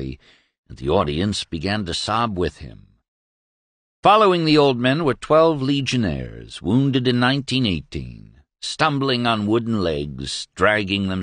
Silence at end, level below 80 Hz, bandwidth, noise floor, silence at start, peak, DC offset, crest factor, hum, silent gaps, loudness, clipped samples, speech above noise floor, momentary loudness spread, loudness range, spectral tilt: 0 s; -44 dBFS; 10 kHz; under -90 dBFS; 0 s; -2 dBFS; under 0.1%; 18 dB; none; 0.58-0.63 s, 3.08-4.03 s; -20 LUFS; under 0.1%; over 70 dB; 14 LU; 6 LU; -5.5 dB/octave